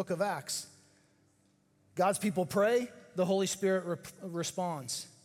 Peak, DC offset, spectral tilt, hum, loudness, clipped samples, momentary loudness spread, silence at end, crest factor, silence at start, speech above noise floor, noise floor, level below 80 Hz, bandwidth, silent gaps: -16 dBFS; under 0.1%; -4.5 dB/octave; none; -33 LUFS; under 0.1%; 11 LU; 0.15 s; 18 dB; 0 s; 37 dB; -70 dBFS; -76 dBFS; 17 kHz; none